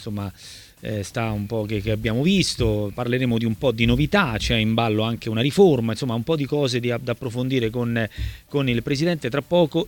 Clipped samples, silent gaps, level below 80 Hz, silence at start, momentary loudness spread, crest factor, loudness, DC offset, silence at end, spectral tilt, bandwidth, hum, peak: under 0.1%; none; -38 dBFS; 0 s; 9 LU; 18 dB; -22 LUFS; under 0.1%; 0 s; -6 dB/octave; 19 kHz; none; -4 dBFS